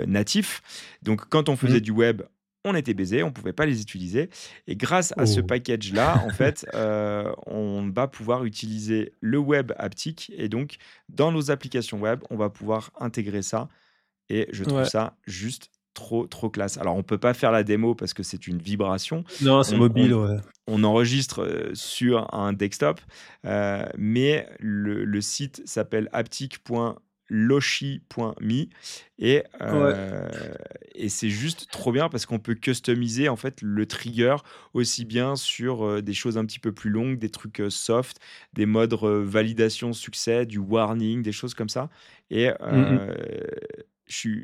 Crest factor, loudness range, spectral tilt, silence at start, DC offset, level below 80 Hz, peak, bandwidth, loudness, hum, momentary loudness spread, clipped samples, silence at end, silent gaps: 20 dB; 5 LU; -5.5 dB/octave; 0 s; under 0.1%; -60 dBFS; -4 dBFS; 15 kHz; -25 LUFS; none; 12 LU; under 0.1%; 0 s; none